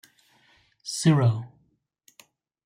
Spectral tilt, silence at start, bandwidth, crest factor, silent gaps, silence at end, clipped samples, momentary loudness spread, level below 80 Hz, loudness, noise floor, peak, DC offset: -6 dB/octave; 0.85 s; 15.5 kHz; 20 dB; none; 1.2 s; under 0.1%; 20 LU; -68 dBFS; -24 LUFS; -69 dBFS; -8 dBFS; under 0.1%